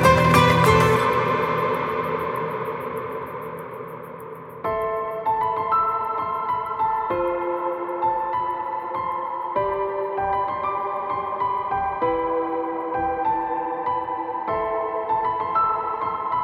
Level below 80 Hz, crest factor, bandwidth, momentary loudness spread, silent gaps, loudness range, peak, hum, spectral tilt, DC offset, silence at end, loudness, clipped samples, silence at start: -48 dBFS; 20 dB; 17.5 kHz; 11 LU; none; 4 LU; -2 dBFS; none; -6 dB/octave; under 0.1%; 0 s; -23 LUFS; under 0.1%; 0 s